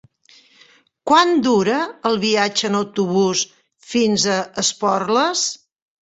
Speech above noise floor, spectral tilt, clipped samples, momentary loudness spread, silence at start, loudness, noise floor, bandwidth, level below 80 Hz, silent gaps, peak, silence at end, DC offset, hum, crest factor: 35 dB; -3 dB/octave; under 0.1%; 7 LU; 1.05 s; -18 LUFS; -53 dBFS; 8.4 kHz; -62 dBFS; none; -2 dBFS; 0.45 s; under 0.1%; none; 18 dB